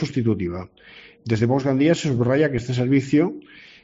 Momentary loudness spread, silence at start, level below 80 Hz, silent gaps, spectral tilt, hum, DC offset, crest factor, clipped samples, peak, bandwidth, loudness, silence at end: 15 LU; 0 s; -54 dBFS; none; -7 dB/octave; none; under 0.1%; 16 dB; under 0.1%; -6 dBFS; 7.8 kHz; -21 LUFS; 0.25 s